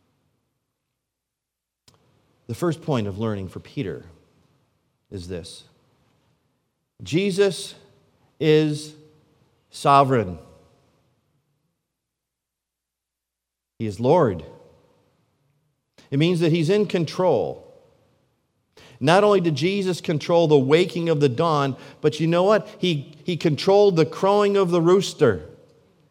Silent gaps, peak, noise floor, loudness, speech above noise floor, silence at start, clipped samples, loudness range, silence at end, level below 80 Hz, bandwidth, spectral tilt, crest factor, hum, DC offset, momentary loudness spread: none; -2 dBFS; -84 dBFS; -21 LUFS; 64 dB; 2.5 s; under 0.1%; 12 LU; 0.65 s; -64 dBFS; 15.5 kHz; -6.5 dB/octave; 22 dB; none; under 0.1%; 17 LU